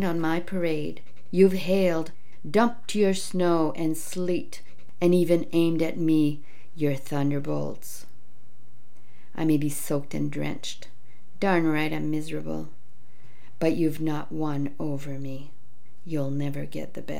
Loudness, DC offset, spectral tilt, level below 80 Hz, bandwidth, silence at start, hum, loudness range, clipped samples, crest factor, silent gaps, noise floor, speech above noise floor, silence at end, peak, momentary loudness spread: -27 LUFS; 4%; -6.5 dB/octave; -66 dBFS; 17 kHz; 0 s; none; 6 LU; under 0.1%; 20 dB; none; -60 dBFS; 34 dB; 0 s; -6 dBFS; 14 LU